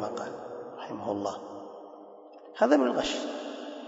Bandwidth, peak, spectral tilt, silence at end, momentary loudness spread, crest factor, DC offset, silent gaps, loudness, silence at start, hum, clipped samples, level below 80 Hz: 8 kHz; -10 dBFS; -4 dB/octave; 0 s; 23 LU; 22 dB; under 0.1%; none; -30 LUFS; 0 s; none; under 0.1%; -66 dBFS